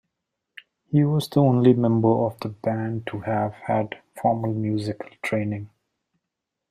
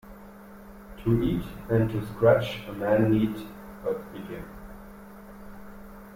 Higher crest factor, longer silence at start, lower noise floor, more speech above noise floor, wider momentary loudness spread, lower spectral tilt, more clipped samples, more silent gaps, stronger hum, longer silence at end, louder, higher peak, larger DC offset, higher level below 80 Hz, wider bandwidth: about the same, 20 dB vs 20 dB; first, 0.9 s vs 0.05 s; first, -83 dBFS vs -46 dBFS; first, 61 dB vs 21 dB; second, 12 LU vs 24 LU; about the same, -8 dB/octave vs -8 dB/octave; neither; neither; neither; first, 1.05 s vs 0 s; first, -23 LUFS vs -26 LUFS; first, -4 dBFS vs -8 dBFS; neither; second, -62 dBFS vs -46 dBFS; second, 14.5 kHz vs 16.5 kHz